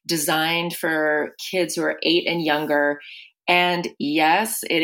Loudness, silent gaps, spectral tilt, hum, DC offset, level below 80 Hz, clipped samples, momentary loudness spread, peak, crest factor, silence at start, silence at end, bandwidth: -21 LUFS; none; -3 dB/octave; none; under 0.1%; -74 dBFS; under 0.1%; 7 LU; -4 dBFS; 18 dB; 0.1 s; 0 s; 17 kHz